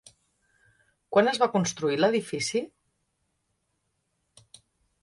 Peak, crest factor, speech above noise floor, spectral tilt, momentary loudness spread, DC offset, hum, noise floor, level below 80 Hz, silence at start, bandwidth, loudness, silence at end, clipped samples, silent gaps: -8 dBFS; 22 dB; 52 dB; -4 dB/octave; 7 LU; under 0.1%; none; -77 dBFS; -70 dBFS; 1.1 s; 11.5 kHz; -26 LUFS; 2.35 s; under 0.1%; none